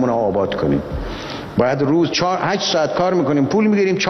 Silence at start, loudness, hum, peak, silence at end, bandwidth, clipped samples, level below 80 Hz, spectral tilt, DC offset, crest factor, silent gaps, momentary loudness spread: 0 s; -18 LUFS; none; -2 dBFS; 0 s; 6.6 kHz; under 0.1%; -38 dBFS; -5.5 dB/octave; under 0.1%; 14 dB; none; 9 LU